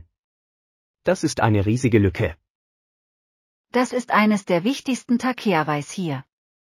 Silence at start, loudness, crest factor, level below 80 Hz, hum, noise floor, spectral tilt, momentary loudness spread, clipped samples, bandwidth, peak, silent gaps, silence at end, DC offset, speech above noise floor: 1.05 s; -21 LUFS; 18 dB; -50 dBFS; none; under -90 dBFS; -6 dB/octave; 9 LU; under 0.1%; 15 kHz; -4 dBFS; 2.50-3.64 s; 0.45 s; under 0.1%; over 70 dB